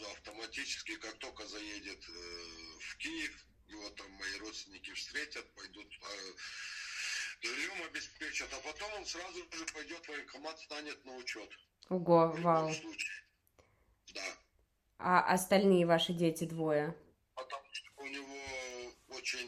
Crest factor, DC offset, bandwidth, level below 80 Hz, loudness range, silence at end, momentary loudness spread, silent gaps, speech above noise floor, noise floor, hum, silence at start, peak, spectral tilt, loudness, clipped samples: 26 dB; under 0.1%; 14 kHz; -70 dBFS; 12 LU; 0 s; 18 LU; none; 38 dB; -75 dBFS; none; 0 s; -12 dBFS; -4 dB/octave; -37 LUFS; under 0.1%